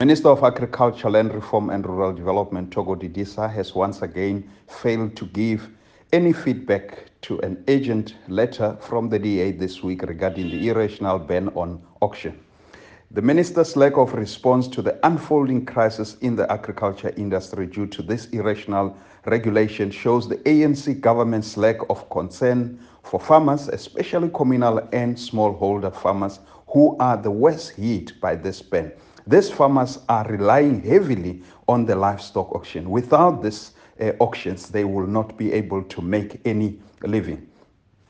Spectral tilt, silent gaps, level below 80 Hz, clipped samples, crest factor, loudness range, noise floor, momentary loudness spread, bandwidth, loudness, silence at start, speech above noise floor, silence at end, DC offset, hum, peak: -7.5 dB/octave; none; -56 dBFS; under 0.1%; 20 dB; 5 LU; -57 dBFS; 11 LU; 9.2 kHz; -21 LUFS; 0 s; 36 dB; 0.65 s; under 0.1%; none; -2 dBFS